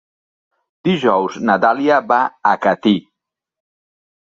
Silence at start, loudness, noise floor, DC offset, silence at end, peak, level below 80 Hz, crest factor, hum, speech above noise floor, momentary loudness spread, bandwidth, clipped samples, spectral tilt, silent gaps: 0.85 s; -16 LUFS; -82 dBFS; under 0.1%; 1.2 s; -2 dBFS; -62 dBFS; 16 dB; none; 67 dB; 5 LU; 7.6 kHz; under 0.1%; -6.5 dB/octave; none